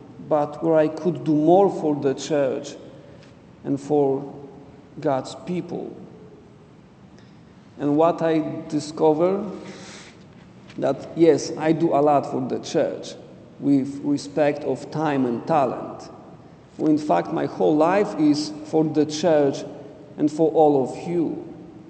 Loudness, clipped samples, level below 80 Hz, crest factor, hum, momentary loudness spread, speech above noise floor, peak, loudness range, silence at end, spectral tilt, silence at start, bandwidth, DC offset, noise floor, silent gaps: -22 LUFS; under 0.1%; -64 dBFS; 20 dB; none; 19 LU; 27 dB; -4 dBFS; 6 LU; 0 s; -6.5 dB/octave; 0 s; 9 kHz; under 0.1%; -48 dBFS; none